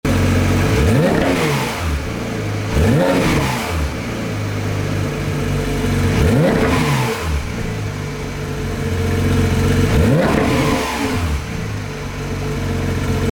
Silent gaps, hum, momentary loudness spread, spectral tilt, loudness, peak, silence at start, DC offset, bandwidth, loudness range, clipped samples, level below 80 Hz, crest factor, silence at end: none; none; 9 LU; -6 dB/octave; -18 LUFS; -2 dBFS; 0.05 s; under 0.1%; over 20 kHz; 2 LU; under 0.1%; -28 dBFS; 14 dB; 0 s